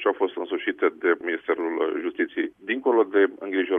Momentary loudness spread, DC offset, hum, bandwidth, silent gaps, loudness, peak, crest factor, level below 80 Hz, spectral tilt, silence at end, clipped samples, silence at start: 6 LU; under 0.1%; none; 3.7 kHz; none; -25 LUFS; -8 dBFS; 16 dB; -74 dBFS; -6.5 dB/octave; 0 s; under 0.1%; 0 s